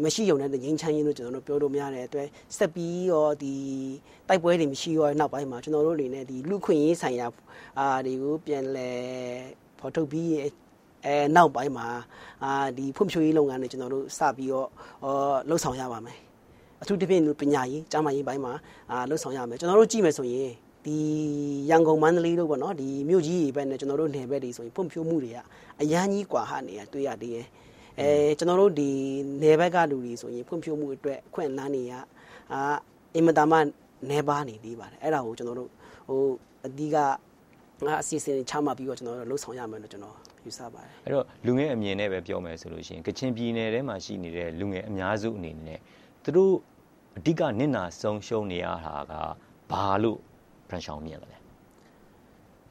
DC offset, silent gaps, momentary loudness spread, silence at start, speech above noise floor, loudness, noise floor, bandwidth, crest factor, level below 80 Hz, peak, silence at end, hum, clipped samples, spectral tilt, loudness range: under 0.1%; none; 16 LU; 0 s; 30 dB; -27 LUFS; -57 dBFS; 15.5 kHz; 24 dB; -62 dBFS; -4 dBFS; 1.35 s; none; under 0.1%; -5.5 dB/octave; 7 LU